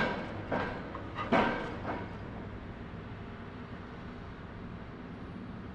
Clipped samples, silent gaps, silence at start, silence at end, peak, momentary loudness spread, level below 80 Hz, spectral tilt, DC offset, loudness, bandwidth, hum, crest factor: under 0.1%; none; 0 s; 0 s; -14 dBFS; 15 LU; -52 dBFS; -7 dB/octave; under 0.1%; -38 LUFS; 9.6 kHz; none; 22 dB